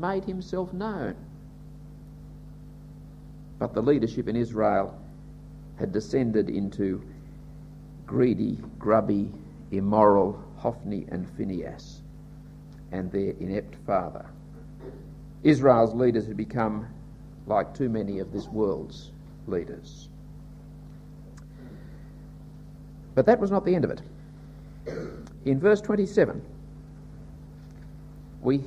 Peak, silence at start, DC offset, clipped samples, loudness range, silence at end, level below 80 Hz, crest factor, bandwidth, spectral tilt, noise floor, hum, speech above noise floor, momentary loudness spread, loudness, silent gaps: -4 dBFS; 0 s; under 0.1%; under 0.1%; 10 LU; 0 s; -48 dBFS; 24 dB; 10.5 kHz; -8 dB/octave; -45 dBFS; 50 Hz at -50 dBFS; 19 dB; 24 LU; -26 LUFS; none